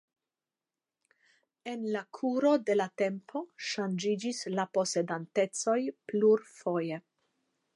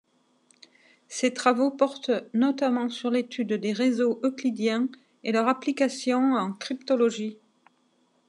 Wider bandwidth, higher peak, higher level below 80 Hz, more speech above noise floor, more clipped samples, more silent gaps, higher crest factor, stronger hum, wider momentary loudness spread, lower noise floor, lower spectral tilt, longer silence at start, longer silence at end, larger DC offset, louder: about the same, 11.5 kHz vs 10.5 kHz; second, -14 dBFS vs -6 dBFS; about the same, -88 dBFS vs under -90 dBFS; first, over 59 dB vs 42 dB; neither; neither; about the same, 18 dB vs 20 dB; neither; first, 11 LU vs 7 LU; first, under -90 dBFS vs -67 dBFS; about the same, -4.5 dB/octave vs -4.5 dB/octave; first, 1.65 s vs 1.1 s; second, 0.75 s vs 0.95 s; neither; second, -31 LUFS vs -26 LUFS